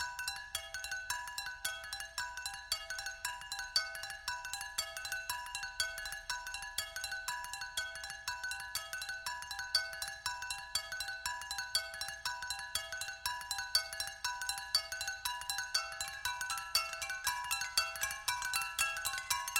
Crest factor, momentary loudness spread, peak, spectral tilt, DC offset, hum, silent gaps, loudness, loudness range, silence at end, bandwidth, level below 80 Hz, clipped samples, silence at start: 24 dB; 7 LU; -16 dBFS; 2 dB/octave; under 0.1%; none; none; -38 LUFS; 4 LU; 0 s; over 20 kHz; -64 dBFS; under 0.1%; 0 s